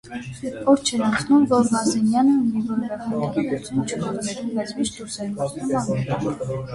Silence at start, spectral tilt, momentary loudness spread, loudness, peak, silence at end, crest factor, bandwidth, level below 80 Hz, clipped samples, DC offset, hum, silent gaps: 0.05 s; -5.5 dB/octave; 9 LU; -22 LUFS; -6 dBFS; 0 s; 16 dB; 11.5 kHz; -54 dBFS; under 0.1%; under 0.1%; none; none